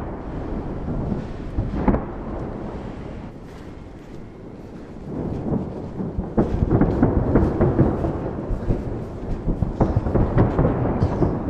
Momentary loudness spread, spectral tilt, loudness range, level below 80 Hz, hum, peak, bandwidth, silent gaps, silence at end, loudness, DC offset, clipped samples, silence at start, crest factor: 19 LU; -10.5 dB/octave; 10 LU; -30 dBFS; none; -4 dBFS; 8 kHz; none; 0 s; -23 LUFS; under 0.1%; under 0.1%; 0 s; 18 dB